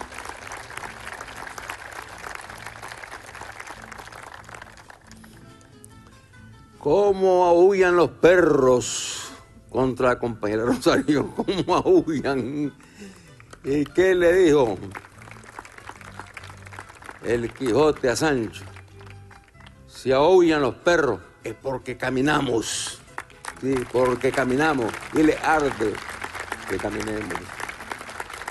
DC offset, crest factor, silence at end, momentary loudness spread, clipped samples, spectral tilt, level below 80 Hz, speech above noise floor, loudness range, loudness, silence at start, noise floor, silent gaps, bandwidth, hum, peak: under 0.1%; 22 dB; 0 s; 23 LU; under 0.1%; -5 dB/octave; -48 dBFS; 28 dB; 17 LU; -22 LUFS; 0 s; -48 dBFS; none; 12.5 kHz; none; -2 dBFS